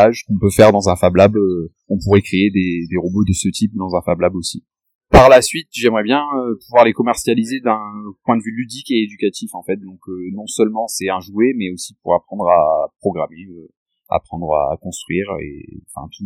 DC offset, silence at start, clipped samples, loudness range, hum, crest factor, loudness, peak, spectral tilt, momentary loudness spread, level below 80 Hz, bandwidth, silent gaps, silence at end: under 0.1%; 0 s; 0.1%; 7 LU; none; 16 dB; -16 LUFS; 0 dBFS; -5.5 dB/octave; 15 LU; -36 dBFS; 16 kHz; 4.95-5.01 s, 13.77-13.86 s; 0 s